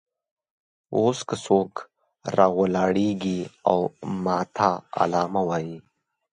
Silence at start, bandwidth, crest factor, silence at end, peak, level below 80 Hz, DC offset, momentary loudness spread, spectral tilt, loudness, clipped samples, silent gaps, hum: 0.9 s; 10.5 kHz; 22 dB; 0.5 s; -4 dBFS; -60 dBFS; under 0.1%; 9 LU; -6.5 dB/octave; -24 LUFS; under 0.1%; none; none